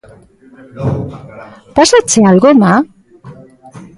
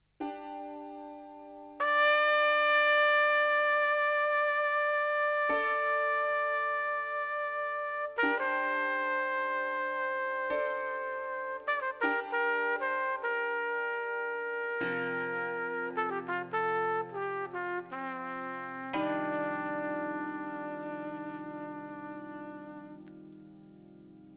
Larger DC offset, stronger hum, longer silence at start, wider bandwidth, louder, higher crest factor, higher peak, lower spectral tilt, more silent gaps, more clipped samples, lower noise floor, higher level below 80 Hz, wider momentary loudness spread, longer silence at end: neither; second, none vs 50 Hz at -75 dBFS; first, 0.75 s vs 0.2 s; first, 11.5 kHz vs 4 kHz; first, -10 LUFS vs -30 LUFS; about the same, 12 dB vs 16 dB; first, 0 dBFS vs -16 dBFS; first, -5 dB/octave vs -1 dB/octave; neither; neither; second, -36 dBFS vs -54 dBFS; first, -42 dBFS vs -76 dBFS; about the same, 17 LU vs 18 LU; first, 0.15 s vs 0 s